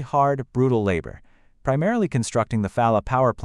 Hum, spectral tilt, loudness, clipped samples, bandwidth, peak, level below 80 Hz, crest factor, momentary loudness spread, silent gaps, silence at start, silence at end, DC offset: none; -7 dB/octave; -22 LUFS; under 0.1%; 11.5 kHz; -6 dBFS; -44 dBFS; 16 dB; 6 LU; none; 0 s; 0 s; under 0.1%